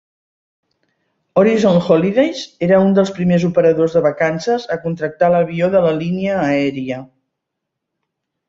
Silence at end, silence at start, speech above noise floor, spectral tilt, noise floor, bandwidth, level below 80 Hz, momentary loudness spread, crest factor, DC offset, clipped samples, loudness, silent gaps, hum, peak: 1.45 s; 1.35 s; 63 dB; -7 dB/octave; -78 dBFS; 7.8 kHz; -54 dBFS; 8 LU; 14 dB; under 0.1%; under 0.1%; -15 LUFS; none; none; -2 dBFS